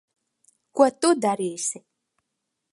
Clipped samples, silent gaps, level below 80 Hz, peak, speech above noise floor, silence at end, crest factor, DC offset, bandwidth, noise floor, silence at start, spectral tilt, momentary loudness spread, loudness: under 0.1%; none; -78 dBFS; -4 dBFS; 59 dB; 0.95 s; 22 dB; under 0.1%; 11.5 kHz; -80 dBFS; 0.75 s; -3.5 dB/octave; 13 LU; -23 LUFS